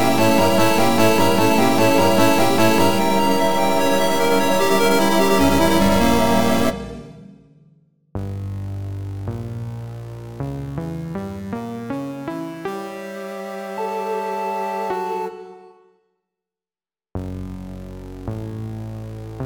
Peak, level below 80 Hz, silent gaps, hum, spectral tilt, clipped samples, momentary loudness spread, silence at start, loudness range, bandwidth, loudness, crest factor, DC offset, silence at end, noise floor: -2 dBFS; -40 dBFS; none; none; -5 dB/octave; under 0.1%; 17 LU; 0 s; 15 LU; 19.5 kHz; -19 LUFS; 18 dB; under 0.1%; 0 s; under -90 dBFS